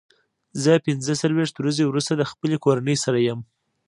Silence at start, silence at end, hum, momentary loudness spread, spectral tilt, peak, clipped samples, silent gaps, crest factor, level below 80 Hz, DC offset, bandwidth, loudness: 0.55 s; 0.45 s; none; 5 LU; -5.5 dB/octave; -4 dBFS; under 0.1%; none; 18 dB; -66 dBFS; under 0.1%; 11.5 kHz; -22 LUFS